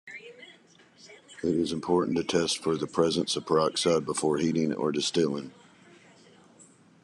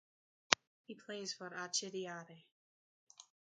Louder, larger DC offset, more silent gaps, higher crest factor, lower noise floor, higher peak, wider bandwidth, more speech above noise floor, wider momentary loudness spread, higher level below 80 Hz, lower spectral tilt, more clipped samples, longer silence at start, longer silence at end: first, -27 LUFS vs -39 LUFS; neither; second, none vs 0.67-0.84 s, 2.52-3.07 s; second, 20 dB vs 44 dB; second, -58 dBFS vs under -90 dBFS; second, -10 dBFS vs -2 dBFS; first, 12 kHz vs 9 kHz; second, 31 dB vs over 45 dB; second, 13 LU vs 25 LU; first, -64 dBFS vs -90 dBFS; first, -4.5 dB/octave vs -1 dB/octave; neither; second, 0.05 s vs 0.5 s; about the same, 0.4 s vs 0.35 s